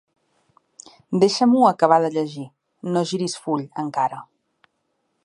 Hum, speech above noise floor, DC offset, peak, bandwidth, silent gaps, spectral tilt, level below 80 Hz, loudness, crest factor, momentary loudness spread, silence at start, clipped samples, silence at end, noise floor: none; 52 dB; under 0.1%; -2 dBFS; 11.5 kHz; none; -5.5 dB/octave; -72 dBFS; -20 LUFS; 20 dB; 17 LU; 1.1 s; under 0.1%; 1 s; -72 dBFS